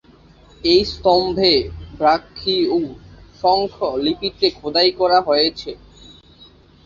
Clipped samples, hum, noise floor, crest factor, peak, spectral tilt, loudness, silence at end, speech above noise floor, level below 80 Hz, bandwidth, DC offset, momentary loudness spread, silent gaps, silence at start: under 0.1%; none; -48 dBFS; 18 dB; -2 dBFS; -5.5 dB/octave; -17 LUFS; 1.1 s; 31 dB; -44 dBFS; 7.2 kHz; under 0.1%; 8 LU; none; 0.65 s